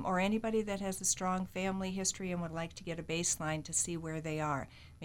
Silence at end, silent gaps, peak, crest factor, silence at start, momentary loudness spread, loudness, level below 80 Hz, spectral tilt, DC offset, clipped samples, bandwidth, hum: 0 s; none; -18 dBFS; 18 dB; 0 s; 8 LU; -35 LUFS; -58 dBFS; -3.5 dB/octave; under 0.1%; under 0.1%; 17 kHz; none